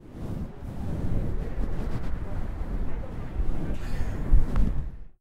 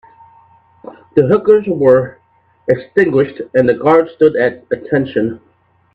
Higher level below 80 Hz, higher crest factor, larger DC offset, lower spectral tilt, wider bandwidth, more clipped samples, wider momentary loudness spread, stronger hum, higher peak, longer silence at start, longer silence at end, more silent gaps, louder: first, -28 dBFS vs -54 dBFS; about the same, 18 dB vs 14 dB; neither; about the same, -8.5 dB/octave vs -9 dB/octave; about the same, 5 kHz vs 5 kHz; neither; about the same, 9 LU vs 10 LU; neither; second, -8 dBFS vs 0 dBFS; second, 0 s vs 1.15 s; second, 0.1 s vs 0.6 s; neither; second, -33 LUFS vs -13 LUFS